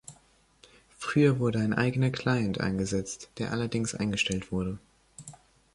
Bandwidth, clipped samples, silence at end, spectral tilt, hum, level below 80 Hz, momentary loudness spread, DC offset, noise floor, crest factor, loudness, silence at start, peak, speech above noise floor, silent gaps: 11.5 kHz; under 0.1%; 0.4 s; -5.5 dB/octave; none; -54 dBFS; 21 LU; under 0.1%; -62 dBFS; 18 dB; -29 LUFS; 0.1 s; -10 dBFS; 35 dB; none